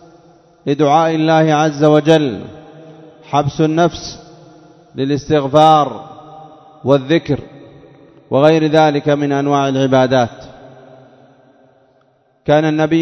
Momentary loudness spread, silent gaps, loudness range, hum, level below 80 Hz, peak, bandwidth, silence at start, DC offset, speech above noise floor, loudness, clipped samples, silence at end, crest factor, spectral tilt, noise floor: 16 LU; none; 4 LU; none; -50 dBFS; 0 dBFS; 8.2 kHz; 0.65 s; under 0.1%; 43 dB; -14 LUFS; under 0.1%; 0 s; 16 dB; -6.5 dB/octave; -56 dBFS